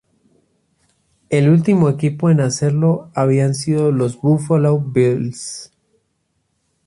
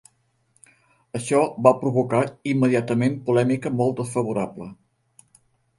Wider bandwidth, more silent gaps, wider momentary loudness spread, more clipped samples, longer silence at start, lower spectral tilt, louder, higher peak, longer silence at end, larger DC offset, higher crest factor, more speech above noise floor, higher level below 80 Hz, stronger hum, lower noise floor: about the same, 11.5 kHz vs 11.5 kHz; neither; second, 8 LU vs 13 LU; neither; first, 1.3 s vs 1.15 s; about the same, -7 dB/octave vs -7 dB/octave; first, -16 LUFS vs -22 LUFS; about the same, -2 dBFS vs -2 dBFS; first, 1.2 s vs 1.05 s; neither; second, 14 dB vs 22 dB; first, 53 dB vs 44 dB; first, -56 dBFS vs -62 dBFS; neither; about the same, -68 dBFS vs -66 dBFS